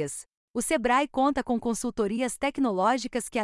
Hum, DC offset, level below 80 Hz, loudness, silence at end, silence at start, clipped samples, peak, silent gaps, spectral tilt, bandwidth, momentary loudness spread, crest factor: none; under 0.1%; -54 dBFS; -27 LUFS; 0 s; 0 s; under 0.1%; -12 dBFS; 0.37-0.54 s; -4 dB/octave; 12 kHz; 8 LU; 16 dB